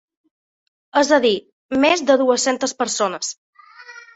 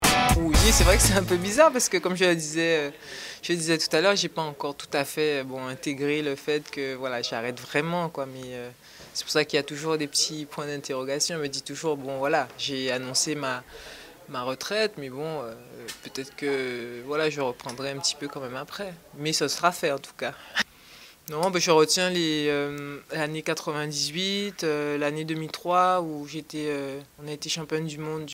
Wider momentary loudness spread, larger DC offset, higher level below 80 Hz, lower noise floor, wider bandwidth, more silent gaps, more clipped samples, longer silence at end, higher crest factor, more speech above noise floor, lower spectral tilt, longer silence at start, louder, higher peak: second, 11 LU vs 15 LU; neither; second, -62 dBFS vs -38 dBFS; second, -42 dBFS vs -50 dBFS; second, 8.2 kHz vs 16 kHz; first, 1.53-1.69 s, 3.37-3.53 s vs none; neither; first, 0.15 s vs 0 s; second, 18 dB vs 24 dB; about the same, 24 dB vs 23 dB; second, -2 dB/octave vs -3.5 dB/octave; first, 0.95 s vs 0 s; first, -18 LUFS vs -26 LUFS; about the same, -2 dBFS vs -4 dBFS